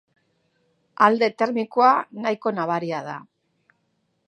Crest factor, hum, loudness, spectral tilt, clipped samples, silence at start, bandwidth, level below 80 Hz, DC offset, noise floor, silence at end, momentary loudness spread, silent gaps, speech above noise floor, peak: 22 dB; none; -21 LUFS; -6 dB/octave; under 0.1%; 1 s; 9.2 kHz; -80 dBFS; under 0.1%; -71 dBFS; 1.05 s; 12 LU; none; 50 dB; -2 dBFS